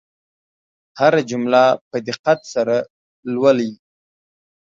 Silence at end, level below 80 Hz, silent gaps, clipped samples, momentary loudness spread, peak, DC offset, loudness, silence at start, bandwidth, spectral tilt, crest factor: 0.9 s; -68 dBFS; 1.81-1.91 s, 2.19-2.24 s, 2.90-3.23 s; under 0.1%; 12 LU; 0 dBFS; under 0.1%; -18 LUFS; 0.95 s; 7.6 kHz; -5.5 dB/octave; 18 dB